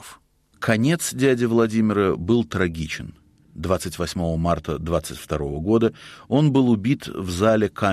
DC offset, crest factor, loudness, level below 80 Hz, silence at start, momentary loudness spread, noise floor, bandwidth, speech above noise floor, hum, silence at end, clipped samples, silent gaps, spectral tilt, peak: under 0.1%; 16 dB; -22 LUFS; -42 dBFS; 0 s; 10 LU; -53 dBFS; 14.5 kHz; 32 dB; none; 0 s; under 0.1%; none; -6 dB/octave; -6 dBFS